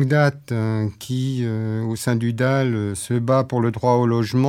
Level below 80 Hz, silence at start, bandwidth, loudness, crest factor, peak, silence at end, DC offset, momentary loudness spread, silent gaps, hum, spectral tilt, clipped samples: -60 dBFS; 0 s; 15 kHz; -21 LUFS; 16 dB; -4 dBFS; 0 s; under 0.1%; 6 LU; none; none; -7 dB/octave; under 0.1%